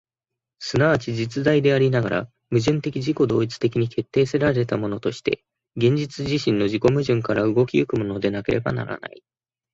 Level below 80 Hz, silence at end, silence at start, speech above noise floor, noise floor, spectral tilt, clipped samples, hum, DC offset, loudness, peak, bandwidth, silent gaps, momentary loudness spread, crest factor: -52 dBFS; 0.65 s; 0.6 s; 65 dB; -86 dBFS; -7 dB/octave; under 0.1%; none; under 0.1%; -22 LUFS; -4 dBFS; 8 kHz; none; 7 LU; 18 dB